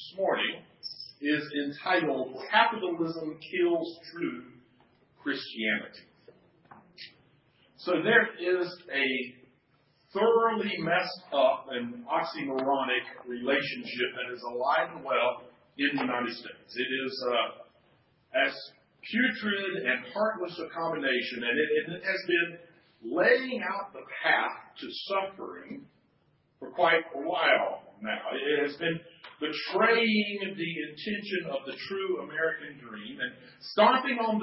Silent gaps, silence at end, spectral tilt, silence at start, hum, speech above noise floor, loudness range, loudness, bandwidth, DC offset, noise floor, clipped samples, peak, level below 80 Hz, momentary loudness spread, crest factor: none; 0 s; -8 dB/octave; 0 s; none; 39 dB; 5 LU; -29 LUFS; 5.8 kHz; under 0.1%; -69 dBFS; under 0.1%; -8 dBFS; -80 dBFS; 16 LU; 22 dB